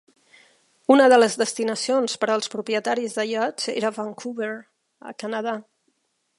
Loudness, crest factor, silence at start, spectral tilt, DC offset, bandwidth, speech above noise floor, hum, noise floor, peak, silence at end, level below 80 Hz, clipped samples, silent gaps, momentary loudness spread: -22 LUFS; 20 dB; 0.9 s; -3 dB/octave; under 0.1%; 11.5 kHz; 49 dB; none; -71 dBFS; -2 dBFS; 0.8 s; -80 dBFS; under 0.1%; none; 15 LU